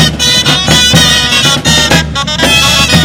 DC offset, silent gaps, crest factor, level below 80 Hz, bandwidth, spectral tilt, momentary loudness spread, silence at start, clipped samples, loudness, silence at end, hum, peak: under 0.1%; none; 8 dB; -24 dBFS; over 20 kHz; -2.5 dB/octave; 4 LU; 0 s; 4%; -6 LUFS; 0 s; none; 0 dBFS